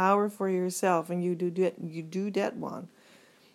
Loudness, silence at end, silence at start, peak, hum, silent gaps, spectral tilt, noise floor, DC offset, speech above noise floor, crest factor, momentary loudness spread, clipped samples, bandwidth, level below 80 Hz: -30 LUFS; 0.65 s; 0 s; -10 dBFS; none; none; -6 dB/octave; -58 dBFS; under 0.1%; 29 dB; 20 dB; 12 LU; under 0.1%; 15.5 kHz; -88 dBFS